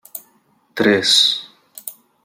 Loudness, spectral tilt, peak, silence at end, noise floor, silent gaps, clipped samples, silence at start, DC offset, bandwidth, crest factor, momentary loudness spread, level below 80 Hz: -14 LUFS; -2 dB/octave; -2 dBFS; 0.35 s; -59 dBFS; none; under 0.1%; 0.15 s; under 0.1%; 17 kHz; 18 dB; 22 LU; -66 dBFS